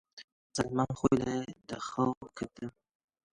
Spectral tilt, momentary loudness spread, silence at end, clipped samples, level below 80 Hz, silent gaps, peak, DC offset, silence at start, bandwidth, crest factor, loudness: -6 dB/octave; 16 LU; 0.65 s; under 0.1%; -58 dBFS; 0.24-0.50 s, 2.17-2.21 s; -12 dBFS; under 0.1%; 0.15 s; 11.5 kHz; 22 dB; -34 LUFS